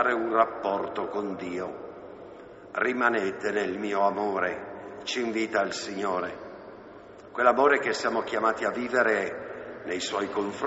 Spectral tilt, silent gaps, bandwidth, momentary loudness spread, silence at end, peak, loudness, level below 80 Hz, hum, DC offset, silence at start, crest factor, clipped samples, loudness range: -2 dB/octave; none; 8 kHz; 19 LU; 0 s; -8 dBFS; -27 LUFS; -66 dBFS; none; under 0.1%; 0 s; 20 dB; under 0.1%; 4 LU